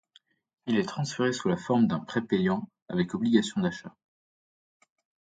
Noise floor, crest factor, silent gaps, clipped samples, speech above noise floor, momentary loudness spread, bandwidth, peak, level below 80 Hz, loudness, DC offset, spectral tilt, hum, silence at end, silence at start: -64 dBFS; 20 dB; 2.82-2.86 s; under 0.1%; 37 dB; 8 LU; 9.2 kHz; -8 dBFS; -64 dBFS; -28 LUFS; under 0.1%; -6 dB/octave; none; 1.5 s; 0.65 s